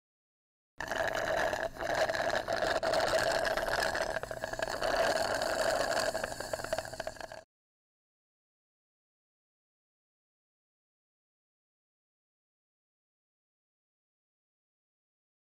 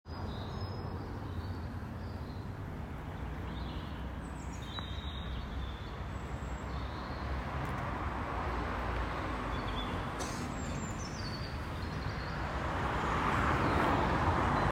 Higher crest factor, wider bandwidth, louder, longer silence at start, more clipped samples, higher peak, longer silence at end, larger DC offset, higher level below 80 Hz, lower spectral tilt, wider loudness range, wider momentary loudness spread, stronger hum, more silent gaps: about the same, 14 dB vs 18 dB; about the same, 16 kHz vs 16 kHz; first, -32 LUFS vs -37 LUFS; first, 0.8 s vs 0.05 s; neither; second, -22 dBFS vs -18 dBFS; first, 8.15 s vs 0 s; neither; second, -56 dBFS vs -44 dBFS; second, -2.5 dB/octave vs -6 dB/octave; first, 12 LU vs 8 LU; about the same, 10 LU vs 12 LU; neither; neither